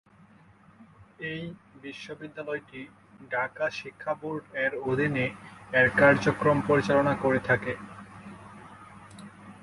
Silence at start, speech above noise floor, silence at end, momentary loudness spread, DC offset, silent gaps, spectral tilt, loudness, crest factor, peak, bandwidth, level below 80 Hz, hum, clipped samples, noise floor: 0.8 s; 29 dB; 0.05 s; 24 LU; under 0.1%; none; -6.5 dB/octave; -26 LUFS; 22 dB; -6 dBFS; 11.5 kHz; -58 dBFS; none; under 0.1%; -56 dBFS